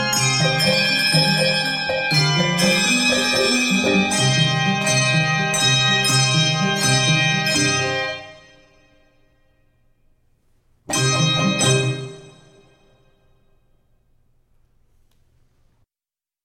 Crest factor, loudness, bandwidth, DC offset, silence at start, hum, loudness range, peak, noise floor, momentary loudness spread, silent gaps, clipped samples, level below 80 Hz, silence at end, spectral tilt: 16 dB; -17 LUFS; 16.5 kHz; under 0.1%; 0 s; none; 9 LU; -4 dBFS; under -90 dBFS; 5 LU; none; under 0.1%; -52 dBFS; 4.15 s; -3 dB/octave